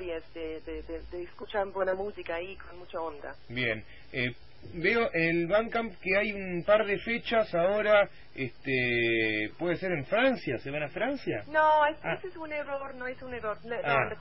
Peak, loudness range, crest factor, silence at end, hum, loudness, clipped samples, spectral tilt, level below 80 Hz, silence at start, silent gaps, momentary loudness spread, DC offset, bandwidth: -12 dBFS; 7 LU; 18 dB; 0 s; none; -30 LUFS; under 0.1%; -9.5 dB/octave; -56 dBFS; 0 s; none; 14 LU; 0.5%; 5.8 kHz